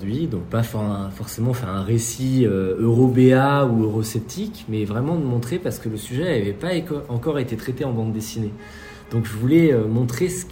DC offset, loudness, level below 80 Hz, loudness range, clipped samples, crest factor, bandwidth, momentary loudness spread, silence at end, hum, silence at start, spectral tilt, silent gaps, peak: under 0.1%; -21 LUFS; -48 dBFS; 6 LU; under 0.1%; 18 dB; 16.5 kHz; 12 LU; 0 s; none; 0 s; -6.5 dB/octave; none; -2 dBFS